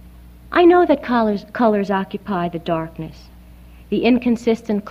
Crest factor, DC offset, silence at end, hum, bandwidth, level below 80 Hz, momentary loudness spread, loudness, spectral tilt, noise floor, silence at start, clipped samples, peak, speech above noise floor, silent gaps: 16 dB; under 0.1%; 0 s; none; 7.8 kHz; -44 dBFS; 12 LU; -18 LUFS; -7.5 dB/octave; -42 dBFS; 0.05 s; under 0.1%; -4 dBFS; 24 dB; none